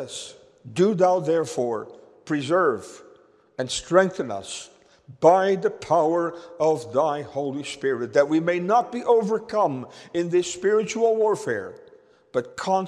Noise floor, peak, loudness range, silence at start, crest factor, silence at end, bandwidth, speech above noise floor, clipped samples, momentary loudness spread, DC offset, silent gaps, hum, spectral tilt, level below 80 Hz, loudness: -55 dBFS; -4 dBFS; 3 LU; 0 s; 20 dB; 0 s; 12 kHz; 32 dB; under 0.1%; 13 LU; under 0.1%; none; none; -5 dB/octave; -64 dBFS; -23 LUFS